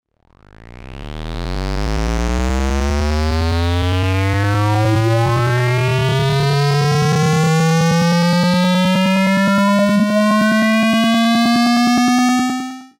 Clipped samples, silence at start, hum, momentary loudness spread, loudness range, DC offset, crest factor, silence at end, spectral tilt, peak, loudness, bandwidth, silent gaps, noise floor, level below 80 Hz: under 0.1%; 0.65 s; none; 7 LU; 6 LU; under 0.1%; 10 dB; 0.15 s; -6 dB/octave; -6 dBFS; -15 LUFS; 16.5 kHz; none; -49 dBFS; -28 dBFS